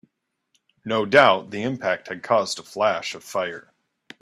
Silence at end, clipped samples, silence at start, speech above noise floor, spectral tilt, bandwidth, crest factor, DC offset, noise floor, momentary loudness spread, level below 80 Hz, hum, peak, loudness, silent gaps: 0.6 s; under 0.1%; 0.85 s; 50 dB; -4 dB/octave; 14 kHz; 24 dB; under 0.1%; -72 dBFS; 13 LU; -68 dBFS; none; 0 dBFS; -22 LUFS; none